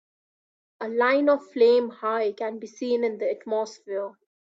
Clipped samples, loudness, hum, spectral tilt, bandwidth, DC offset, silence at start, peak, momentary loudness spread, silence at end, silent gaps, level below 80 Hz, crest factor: under 0.1%; -25 LUFS; none; -4.5 dB/octave; 7.6 kHz; under 0.1%; 0.8 s; -8 dBFS; 13 LU; 0.35 s; none; -76 dBFS; 16 dB